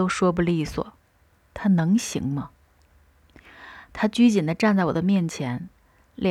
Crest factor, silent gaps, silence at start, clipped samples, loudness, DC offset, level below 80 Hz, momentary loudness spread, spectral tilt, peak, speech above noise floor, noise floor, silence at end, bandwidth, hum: 16 dB; none; 0 s; under 0.1%; -23 LUFS; under 0.1%; -50 dBFS; 21 LU; -6 dB/octave; -8 dBFS; 39 dB; -61 dBFS; 0 s; 13 kHz; none